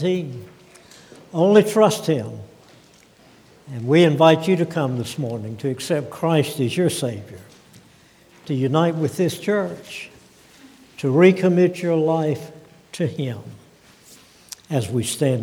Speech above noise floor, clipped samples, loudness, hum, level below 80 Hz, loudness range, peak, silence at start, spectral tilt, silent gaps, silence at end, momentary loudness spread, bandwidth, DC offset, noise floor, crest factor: 32 dB; under 0.1%; -20 LUFS; none; -64 dBFS; 5 LU; 0 dBFS; 0 s; -6 dB/octave; none; 0 s; 20 LU; 17.5 kHz; under 0.1%; -52 dBFS; 20 dB